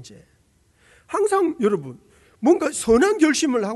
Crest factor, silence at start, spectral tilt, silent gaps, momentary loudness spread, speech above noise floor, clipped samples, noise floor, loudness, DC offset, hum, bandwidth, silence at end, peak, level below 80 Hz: 16 dB; 0 s; -4 dB/octave; none; 9 LU; 40 dB; under 0.1%; -60 dBFS; -20 LUFS; under 0.1%; none; 12 kHz; 0 s; -6 dBFS; -52 dBFS